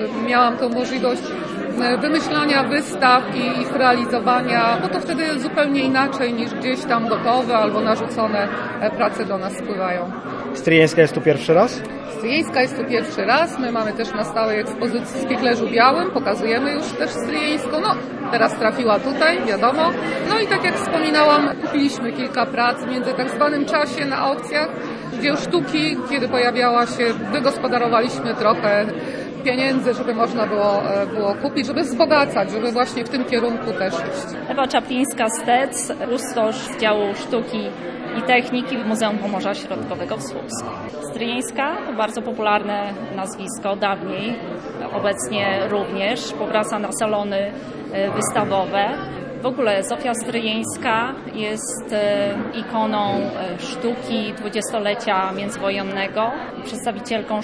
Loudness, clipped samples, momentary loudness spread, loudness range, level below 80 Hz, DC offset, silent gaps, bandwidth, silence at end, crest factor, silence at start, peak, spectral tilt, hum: -20 LUFS; under 0.1%; 10 LU; 5 LU; -56 dBFS; under 0.1%; none; 11 kHz; 0 s; 20 dB; 0 s; 0 dBFS; -4.5 dB/octave; none